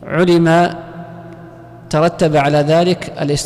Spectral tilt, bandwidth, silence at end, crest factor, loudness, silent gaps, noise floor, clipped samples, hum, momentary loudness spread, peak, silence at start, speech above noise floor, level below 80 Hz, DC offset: -6 dB/octave; 13 kHz; 0 s; 8 dB; -14 LUFS; none; -36 dBFS; under 0.1%; 60 Hz at -40 dBFS; 21 LU; -6 dBFS; 0 s; 23 dB; -44 dBFS; under 0.1%